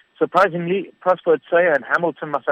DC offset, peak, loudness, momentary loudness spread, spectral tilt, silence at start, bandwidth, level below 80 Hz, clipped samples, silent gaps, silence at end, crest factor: under 0.1%; -4 dBFS; -19 LUFS; 6 LU; -7 dB/octave; 0.2 s; 9.4 kHz; -64 dBFS; under 0.1%; none; 0 s; 14 dB